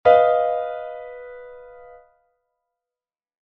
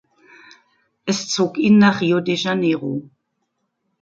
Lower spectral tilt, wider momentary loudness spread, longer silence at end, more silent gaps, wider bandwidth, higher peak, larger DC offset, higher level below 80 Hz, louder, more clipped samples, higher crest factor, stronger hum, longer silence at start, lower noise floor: second, -1.5 dB/octave vs -5 dB/octave; first, 26 LU vs 14 LU; first, 1.95 s vs 1 s; neither; second, 5.4 kHz vs 7.8 kHz; about the same, -2 dBFS vs -2 dBFS; neither; about the same, -62 dBFS vs -64 dBFS; about the same, -20 LUFS vs -18 LUFS; neither; about the same, 20 dB vs 18 dB; neither; second, 0.05 s vs 1.05 s; first, under -90 dBFS vs -73 dBFS